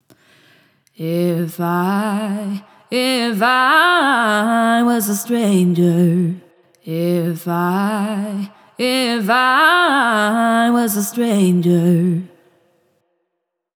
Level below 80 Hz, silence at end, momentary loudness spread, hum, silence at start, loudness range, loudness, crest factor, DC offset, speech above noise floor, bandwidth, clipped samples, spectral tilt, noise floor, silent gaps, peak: -84 dBFS; 1.5 s; 11 LU; none; 1 s; 5 LU; -16 LUFS; 14 dB; under 0.1%; 60 dB; over 20 kHz; under 0.1%; -5 dB/octave; -76 dBFS; none; -2 dBFS